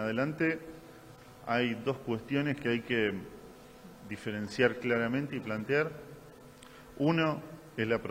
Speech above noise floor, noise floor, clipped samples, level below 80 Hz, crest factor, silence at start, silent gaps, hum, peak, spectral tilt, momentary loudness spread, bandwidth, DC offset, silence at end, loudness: 21 dB; -53 dBFS; under 0.1%; -64 dBFS; 22 dB; 0 s; none; none; -12 dBFS; -6.5 dB/octave; 23 LU; 16 kHz; under 0.1%; 0 s; -32 LUFS